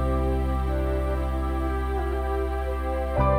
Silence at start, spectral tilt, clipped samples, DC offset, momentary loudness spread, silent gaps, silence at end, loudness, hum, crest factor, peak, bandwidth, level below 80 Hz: 0 s; -8.5 dB/octave; under 0.1%; under 0.1%; 3 LU; none; 0 s; -27 LUFS; none; 14 dB; -10 dBFS; 14.5 kHz; -28 dBFS